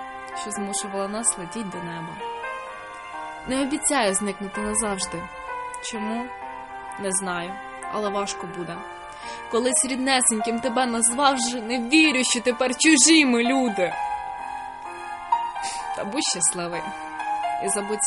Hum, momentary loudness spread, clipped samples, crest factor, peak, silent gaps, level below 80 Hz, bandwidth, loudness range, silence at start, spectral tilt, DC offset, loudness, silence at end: none; 16 LU; under 0.1%; 22 dB; -2 dBFS; none; -56 dBFS; 11.5 kHz; 10 LU; 0 s; -2 dB/octave; under 0.1%; -23 LUFS; 0 s